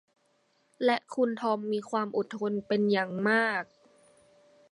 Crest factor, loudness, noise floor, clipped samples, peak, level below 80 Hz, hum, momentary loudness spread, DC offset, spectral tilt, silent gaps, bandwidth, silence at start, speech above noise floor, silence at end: 18 dB; -29 LUFS; -70 dBFS; under 0.1%; -12 dBFS; -78 dBFS; none; 6 LU; under 0.1%; -6 dB/octave; none; 11 kHz; 0.8 s; 42 dB; 1.05 s